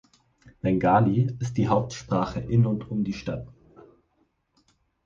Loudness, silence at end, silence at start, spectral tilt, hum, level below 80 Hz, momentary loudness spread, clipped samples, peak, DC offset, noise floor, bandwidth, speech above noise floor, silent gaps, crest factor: -25 LUFS; 1.55 s; 0.45 s; -8 dB/octave; none; -50 dBFS; 12 LU; under 0.1%; -8 dBFS; under 0.1%; -70 dBFS; 7.4 kHz; 46 dB; none; 18 dB